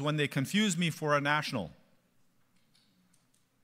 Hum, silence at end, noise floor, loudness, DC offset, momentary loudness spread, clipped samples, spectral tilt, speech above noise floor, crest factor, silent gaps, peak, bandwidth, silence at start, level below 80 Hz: none; 1.9 s; -70 dBFS; -30 LUFS; under 0.1%; 9 LU; under 0.1%; -4.5 dB/octave; 40 dB; 20 dB; none; -14 dBFS; 16 kHz; 0 s; -72 dBFS